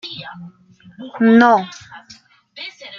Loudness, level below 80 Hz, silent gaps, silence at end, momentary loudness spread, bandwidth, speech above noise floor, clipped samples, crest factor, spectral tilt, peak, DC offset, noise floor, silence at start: -13 LUFS; -66 dBFS; none; 0 s; 26 LU; 7 kHz; 32 dB; under 0.1%; 18 dB; -6 dB/octave; 0 dBFS; under 0.1%; -47 dBFS; 0.05 s